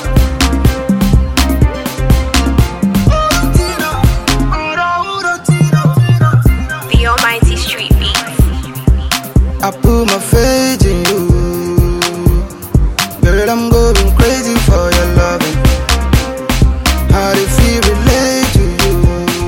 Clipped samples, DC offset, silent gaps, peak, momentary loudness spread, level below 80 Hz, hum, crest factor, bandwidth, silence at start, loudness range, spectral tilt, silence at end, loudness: under 0.1%; 0.1%; none; 0 dBFS; 4 LU; -14 dBFS; none; 10 dB; 17 kHz; 0 s; 1 LU; -5 dB/octave; 0 s; -12 LUFS